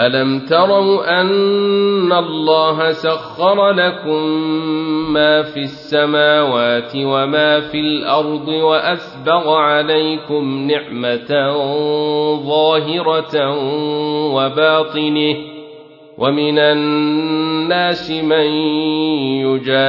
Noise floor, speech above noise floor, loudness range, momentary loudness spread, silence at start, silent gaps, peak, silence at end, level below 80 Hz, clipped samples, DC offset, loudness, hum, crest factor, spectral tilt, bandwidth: -39 dBFS; 24 dB; 2 LU; 6 LU; 0 s; none; 0 dBFS; 0 s; -58 dBFS; under 0.1%; under 0.1%; -15 LUFS; none; 14 dB; -7.5 dB/octave; 6 kHz